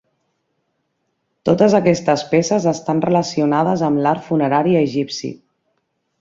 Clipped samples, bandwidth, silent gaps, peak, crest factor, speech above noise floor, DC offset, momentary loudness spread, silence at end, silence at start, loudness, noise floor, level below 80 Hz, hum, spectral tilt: under 0.1%; 7.8 kHz; none; -2 dBFS; 16 dB; 54 dB; under 0.1%; 9 LU; 0.85 s; 1.45 s; -17 LUFS; -71 dBFS; -58 dBFS; none; -6 dB/octave